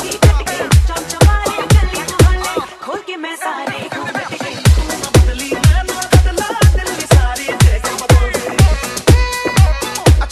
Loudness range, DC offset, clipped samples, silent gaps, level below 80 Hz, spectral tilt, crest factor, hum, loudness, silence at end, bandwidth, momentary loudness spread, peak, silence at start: 4 LU; under 0.1%; under 0.1%; none; -16 dBFS; -5 dB/octave; 12 dB; none; -14 LUFS; 0 s; 13 kHz; 9 LU; 0 dBFS; 0 s